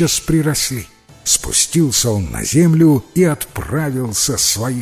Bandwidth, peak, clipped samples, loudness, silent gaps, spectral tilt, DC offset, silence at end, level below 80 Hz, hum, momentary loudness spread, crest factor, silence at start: 16 kHz; 0 dBFS; under 0.1%; -15 LUFS; none; -4 dB/octave; under 0.1%; 0 s; -36 dBFS; none; 8 LU; 16 dB; 0 s